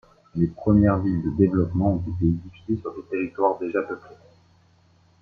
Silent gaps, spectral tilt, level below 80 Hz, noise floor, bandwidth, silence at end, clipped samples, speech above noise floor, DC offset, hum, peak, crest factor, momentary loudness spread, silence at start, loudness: none; -11.5 dB/octave; -46 dBFS; -59 dBFS; 4.7 kHz; 1.05 s; under 0.1%; 36 dB; under 0.1%; none; -4 dBFS; 20 dB; 12 LU; 0.35 s; -24 LUFS